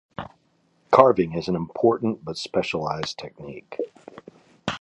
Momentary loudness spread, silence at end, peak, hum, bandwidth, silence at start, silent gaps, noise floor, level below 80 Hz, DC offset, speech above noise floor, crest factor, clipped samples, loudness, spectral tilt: 21 LU; 0.05 s; 0 dBFS; none; 11 kHz; 0.2 s; none; -65 dBFS; -56 dBFS; under 0.1%; 42 dB; 24 dB; under 0.1%; -23 LUFS; -6 dB/octave